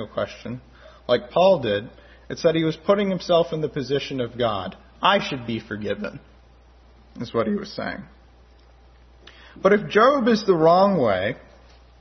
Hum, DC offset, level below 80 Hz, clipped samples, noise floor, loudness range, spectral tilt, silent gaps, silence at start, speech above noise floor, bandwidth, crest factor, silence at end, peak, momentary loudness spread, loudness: none; under 0.1%; -52 dBFS; under 0.1%; -51 dBFS; 11 LU; -6 dB/octave; none; 0 s; 30 dB; 6.4 kHz; 20 dB; 0.65 s; -4 dBFS; 19 LU; -22 LUFS